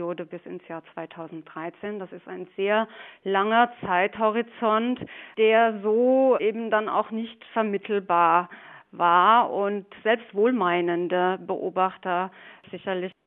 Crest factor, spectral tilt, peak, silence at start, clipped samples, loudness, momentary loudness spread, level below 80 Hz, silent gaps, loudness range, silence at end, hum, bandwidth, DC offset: 20 dB; -3 dB/octave; -4 dBFS; 0 s; under 0.1%; -24 LUFS; 18 LU; -74 dBFS; none; 4 LU; 0.15 s; none; 4 kHz; under 0.1%